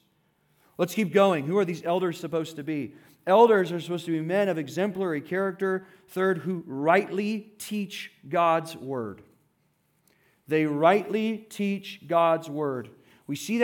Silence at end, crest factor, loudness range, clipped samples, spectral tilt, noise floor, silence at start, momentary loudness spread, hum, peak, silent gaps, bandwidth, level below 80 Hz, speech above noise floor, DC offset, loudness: 0 s; 20 dB; 4 LU; under 0.1%; -6 dB/octave; -70 dBFS; 0.8 s; 13 LU; none; -6 dBFS; none; 18 kHz; -80 dBFS; 44 dB; under 0.1%; -26 LUFS